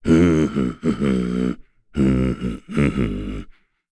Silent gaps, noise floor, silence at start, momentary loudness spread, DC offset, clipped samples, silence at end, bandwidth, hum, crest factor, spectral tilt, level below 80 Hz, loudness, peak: none; -43 dBFS; 0 s; 14 LU; under 0.1%; under 0.1%; 0.4 s; 11 kHz; none; 16 dB; -8 dB/octave; -34 dBFS; -21 LUFS; -6 dBFS